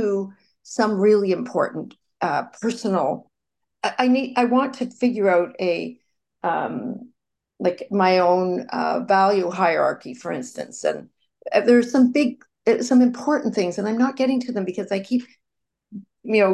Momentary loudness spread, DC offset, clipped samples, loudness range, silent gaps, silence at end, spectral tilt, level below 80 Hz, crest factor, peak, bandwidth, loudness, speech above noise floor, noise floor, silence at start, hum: 14 LU; under 0.1%; under 0.1%; 4 LU; none; 0 s; -5.5 dB/octave; -72 dBFS; 16 dB; -4 dBFS; 9.8 kHz; -21 LUFS; 63 dB; -83 dBFS; 0 s; none